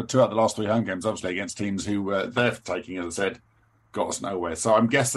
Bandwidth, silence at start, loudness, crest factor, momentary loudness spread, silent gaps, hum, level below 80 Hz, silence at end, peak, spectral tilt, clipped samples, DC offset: 12.5 kHz; 0 s; -25 LUFS; 18 dB; 10 LU; none; none; -58 dBFS; 0 s; -6 dBFS; -4.5 dB/octave; under 0.1%; under 0.1%